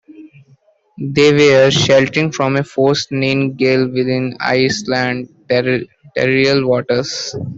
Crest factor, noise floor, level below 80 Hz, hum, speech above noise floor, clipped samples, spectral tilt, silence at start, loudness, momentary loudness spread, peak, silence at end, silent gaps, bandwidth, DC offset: 14 dB; -52 dBFS; -52 dBFS; none; 38 dB; under 0.1%; -5 dB/octave; 0.1 s; -14 LUFS; 10 LU; -2 dBFS; 0 s; none; 8 kHz; under 0.1%